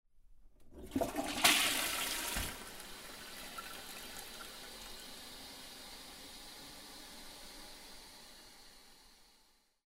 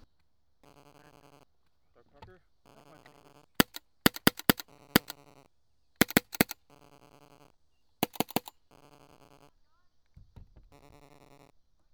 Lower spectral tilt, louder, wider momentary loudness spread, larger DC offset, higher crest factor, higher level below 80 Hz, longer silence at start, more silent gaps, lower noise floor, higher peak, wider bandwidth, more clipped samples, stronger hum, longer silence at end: second, -1 dB/octave vs -3.5 dB/octave; second, -37 LUFS vs -29 LUFS; first, 23 LU vs 15 LU; neither; about the same, 30 dB vs 34 dB; about the same, -58 dBFS vs -58 dBFS; second, 0.15 s vs 3.6 s; neither; second, -70 dBFS vs -77 dBFS; second, -12 dBFS vs -2 dBFS; second, 16 kHz vs over 20 kHz; neither; neither; second, 0.5 s vs 3.55 s